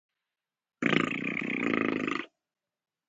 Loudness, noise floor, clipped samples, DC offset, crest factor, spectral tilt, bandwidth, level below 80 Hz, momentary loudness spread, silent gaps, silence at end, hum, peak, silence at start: -30 LUFS; under -90 dBFS; under 0.1%; under 0.1%; 24 dB; -5.5 dB/octave; 9 kHz; -72 dBFS; 7 LU; none; 0.8 s; none; -8 dBFS; 0.8 s